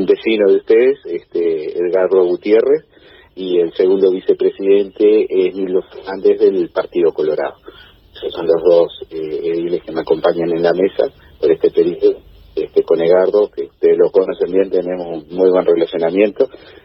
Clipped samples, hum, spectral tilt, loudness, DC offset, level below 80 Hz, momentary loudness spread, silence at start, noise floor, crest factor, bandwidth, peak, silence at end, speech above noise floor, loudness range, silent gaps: under 0.1%; none; -9.5 dB/octave; -15 LUFS; under 0.1%; -52 dBFS; 9 LU; 0 s; -41 dBFS; 14 dB; 5.8 kHz; 0 dBFS; 0.35 s; 27 dB; 3 LU; none